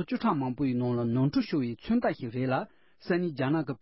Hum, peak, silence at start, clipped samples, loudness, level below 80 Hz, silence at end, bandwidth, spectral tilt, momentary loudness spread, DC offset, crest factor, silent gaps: none; -14 dBFS; 0 s; under 0.1%; -29 LUFS; -60 dBFS; 0.05 s; 5.8 kHz; -11.5 dB/octave; 5 LU; under 0.1%; 14 dB; none